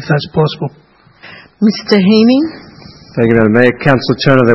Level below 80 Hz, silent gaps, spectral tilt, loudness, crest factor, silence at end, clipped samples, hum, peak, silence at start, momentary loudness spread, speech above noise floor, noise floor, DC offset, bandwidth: -44 dBFS; none; -7.5 dB/octave; -11 LUFS; 12 dB; 0 s; 0.4%; none; 0 dBFS; 0 s; 12 LU; 28 dB; -38 dBFS; under 0.1%; 6 kHz